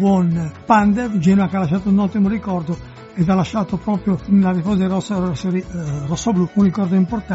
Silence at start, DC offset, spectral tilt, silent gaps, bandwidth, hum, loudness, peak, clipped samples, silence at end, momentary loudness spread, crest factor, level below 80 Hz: 0 s; under 0.1%; -7.5 dB/octave; none; 8 kHz; none; -18 LUFS; 0 dBFS; under 0.1%; 0 s; 8 LU; 16 dB; -42 dBFS